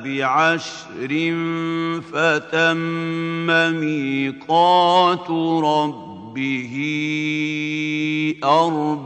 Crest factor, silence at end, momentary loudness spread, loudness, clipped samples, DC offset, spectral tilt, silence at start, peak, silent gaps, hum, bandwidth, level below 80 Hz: 16 dB; 0 s; 8 LU; -19 LUFS; under 0.1%; under 0.1%; -5.5 dB/octave; 0 s; -4 dBFS; none; none; 8.8 kHz; -70 dBFS